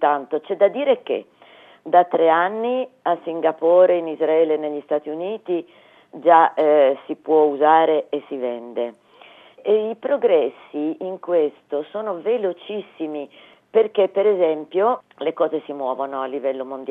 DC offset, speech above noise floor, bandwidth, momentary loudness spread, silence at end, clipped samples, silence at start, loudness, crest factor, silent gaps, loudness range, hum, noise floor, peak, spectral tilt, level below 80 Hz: under 0.1%; 28 dB; 4 kHz; 13 LU; 0 s; under 0.1%; 0 s; -20 LUFS; 18 dB; none; 5 LU; none; -48 dBFS; -2 dBFS; -8 dB/octave; -88 dBFS